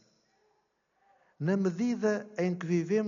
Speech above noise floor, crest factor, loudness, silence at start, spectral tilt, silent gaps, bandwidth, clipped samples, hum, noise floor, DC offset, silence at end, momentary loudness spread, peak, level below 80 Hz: 46 dB; 16 dB; -31 LUFS; 1.4 s; -7.5 dB/octave; none; 7.2 kHz; under 0.1%; none; -75 dBFS; under 0.1%; 0 s; 4 LU; -16 dBFS; -78 dBFS